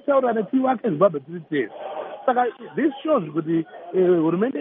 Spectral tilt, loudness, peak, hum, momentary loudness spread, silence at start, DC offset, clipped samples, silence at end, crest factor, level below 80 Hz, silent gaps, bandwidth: -6.5 dB/octave; -22 LUFS; -6 dBFS; none; 8 LU; 0.05 s; under 0.1%; under 0.1%; 0 s; 16 dB; -76 dBFS; none; 3.8 kHz